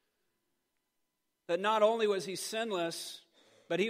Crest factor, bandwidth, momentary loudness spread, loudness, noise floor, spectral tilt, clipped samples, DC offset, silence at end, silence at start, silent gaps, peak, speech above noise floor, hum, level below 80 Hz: 20 dB; 16 kHz; 14 LU; -33 LUFS; -83 dBFS; -3.5 dB/octave; under 0.1%; under 0.1%; 0 s; 1.5 s; none; -16 dBFS; 51 dB; none; under -90 dBFS